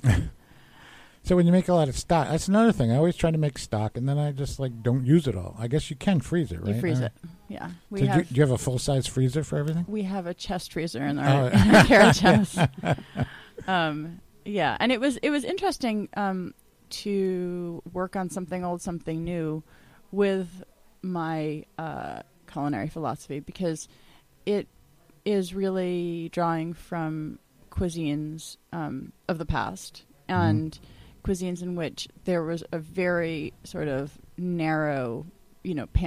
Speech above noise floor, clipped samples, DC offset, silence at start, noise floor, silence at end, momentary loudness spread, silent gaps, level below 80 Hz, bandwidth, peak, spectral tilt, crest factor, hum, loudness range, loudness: 32 dB; under 0.1%; under 0.1%; 0.05 s; -57 dBFS; 0 s; 15 LU; none; -44 dBFS; 15.5 kHz; -6 dBFS; -6 dB/octave; 20 dB; none; 11 LU; -26 LUFS